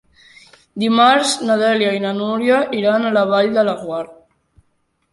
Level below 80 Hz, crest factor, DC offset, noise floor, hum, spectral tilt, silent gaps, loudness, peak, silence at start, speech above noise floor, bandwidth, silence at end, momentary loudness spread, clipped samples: -62 dBFS; 16 dB; under 0.1%; -65 dBFS; none; -4 dB/octave; none; -16 LUFS; -2 dBFS; 0.75 s; 50 dB; 11.5 kHz; 1 s; 13 LU; under 0.1%